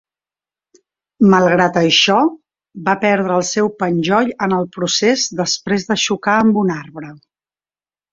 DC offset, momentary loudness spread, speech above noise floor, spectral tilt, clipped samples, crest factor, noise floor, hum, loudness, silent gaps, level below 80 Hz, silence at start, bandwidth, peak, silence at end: under 0.1%; 8 LU; over 75 dB; -4 dB/octave; under 0.1%; 16 dB; under -90 dBFS; none; -15 LUFS; none; -56 dBFS; 1.2 s; 7.8 kHz; 0 dBFS; 0.95 s